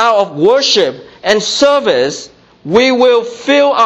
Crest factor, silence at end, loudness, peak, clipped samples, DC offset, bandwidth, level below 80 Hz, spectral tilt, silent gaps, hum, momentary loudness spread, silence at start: 12 dB; 0 s; -11 LUFS; 0 dBFS; under 0.1%; under 0.1%; 8.4 kHz; -52 dBFS; -3 dB/octave; none; none; 9 LU; 0 s